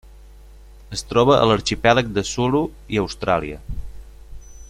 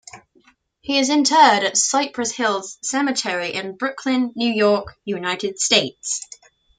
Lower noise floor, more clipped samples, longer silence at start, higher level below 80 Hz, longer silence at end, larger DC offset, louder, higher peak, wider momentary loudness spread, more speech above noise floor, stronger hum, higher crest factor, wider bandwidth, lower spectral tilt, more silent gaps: second, -43 dBFS vs -58 dBFS; neither; about the same, 0.05 s vs 0.15 s; first, -38 dBFS vs -62 dBFS; second, 0.05 s vs 0.6 s; neither; about the same, -19 LUFS vs -19 LUFS; about the same, -2 dBFS vs -2 dBFS; first, 16 LU vs 12 LU; second, 24 dB vs 38 dB; neither; about the same, 20 dB vs 20 dB; first, 15 kHz vs 9.8 kHz; first, -5 dB/octave vs -2 dB/octave; neither